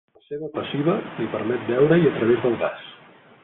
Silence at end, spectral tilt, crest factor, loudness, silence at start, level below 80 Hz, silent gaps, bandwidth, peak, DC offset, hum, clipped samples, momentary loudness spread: 0.5 s; -6 dB/octave; 16 dB; -22 LUFS; 0.3 s; -60 dBFS; none; 4 kHz; -6 dBFS; under 0.1%; none; under 0.1%; 16 LU